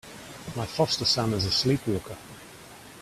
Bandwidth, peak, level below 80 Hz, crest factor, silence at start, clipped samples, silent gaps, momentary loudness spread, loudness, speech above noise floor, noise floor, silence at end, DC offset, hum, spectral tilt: 15 kHz; -12 dBFS; -54 dBFS; 18 dB; 0.05 s; under 0.1%; none; 22 LU; -26 LUFS; 20 dB; -47 dBFS; 0 s; under 0.1%; none; -4.5 dB/octave